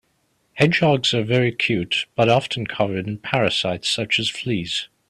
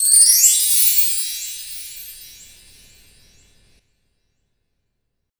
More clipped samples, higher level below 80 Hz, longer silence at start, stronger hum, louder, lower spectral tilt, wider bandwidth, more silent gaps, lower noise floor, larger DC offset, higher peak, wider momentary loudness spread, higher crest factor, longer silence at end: neither; about the same, -56 dBFS vs -58 dBFS; first, 0.55 s vs 0 s; neither; second, -20 LUFS vs -12 LUFS; first, -5 dB/octave vs 5 dB/octave; second, 12.5 kHz vs over 20 kHz; neither; second, -66 dBFS vs -74 dBFS; neither; about the same, -2 dBFS vs 0 dBFS; second, 7 LU vs 23 LU; about the same, 20 dB vs 20 dB; second, 0.25 s vs 3.15 s